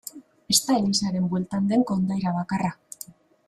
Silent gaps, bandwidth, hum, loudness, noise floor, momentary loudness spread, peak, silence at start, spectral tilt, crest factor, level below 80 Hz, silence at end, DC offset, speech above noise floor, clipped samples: none; 15 kHz; none; -24 LUFS; -46 dBFS; 19 LU; -4 dBFS; 0.05 s; -4.5 dB/octave; 22 dB; -58 dBFS; 0.35 s; under 0.1%; 22 dB; under 0.1%